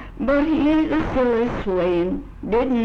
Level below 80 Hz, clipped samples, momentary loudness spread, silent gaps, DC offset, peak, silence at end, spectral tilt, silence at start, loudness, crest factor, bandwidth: -36 dBFS; under 0.1%; 5 LU; none; under 0.1%; -10 dBFS; 0 s; -8 dB/octave; 0 s; -21 LUFS; 10 dB; 6.8 kHz